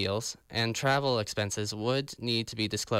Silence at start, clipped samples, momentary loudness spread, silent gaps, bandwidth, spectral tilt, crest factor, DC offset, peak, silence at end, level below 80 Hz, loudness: 0 s; under 0.1%; 5 LU; none; 16 kHz; -4 dB/octave; 14 dB; under 0.1%; -16 dBFS; 0 s; -62 dBFS; -30 LUFS